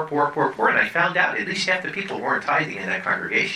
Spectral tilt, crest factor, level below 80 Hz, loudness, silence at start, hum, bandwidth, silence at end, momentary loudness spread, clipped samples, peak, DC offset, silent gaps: -4 dB/octave; 18 dB; -66 dBFS; -21 LUFS; 0 s; none; 14.5 kHz; 0 s; 6 LU; under 0.1%; -4 dBFS; under 0.1%; none